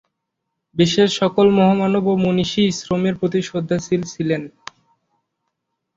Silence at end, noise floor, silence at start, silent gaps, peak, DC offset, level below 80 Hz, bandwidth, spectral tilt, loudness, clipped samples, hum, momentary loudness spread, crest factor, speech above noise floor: 1.45 s; -78 dBFS; 0.75 s; none; -2 dBFS; under 0.1%; -54 dBFS; 7.8 kHz; -6 dB/octave; -18 LUFS; under 0.1%; none; 8 LU; 16 dB; 60 dB